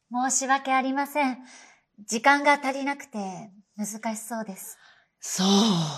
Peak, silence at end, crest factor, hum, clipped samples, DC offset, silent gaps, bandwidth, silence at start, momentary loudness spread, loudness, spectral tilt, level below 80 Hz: -6 dBFS; 0 s; 20 dB; none; under 0.1%; under 0.1%; none; 14.5 kHz; 0.1 s; 18 LU; -25 LUFS; -3.5 dB/octave; -78 dBFS